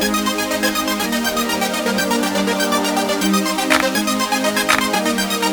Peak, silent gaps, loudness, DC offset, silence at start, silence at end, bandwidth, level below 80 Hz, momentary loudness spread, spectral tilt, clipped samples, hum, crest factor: -2 dBFS; none; -17 LUFS; under 0.1%; 0 s; 0 s; over 20 kHz; -48 dBFS; 3 LU; -3 dB/octave; under 0.1%; none; 16 dB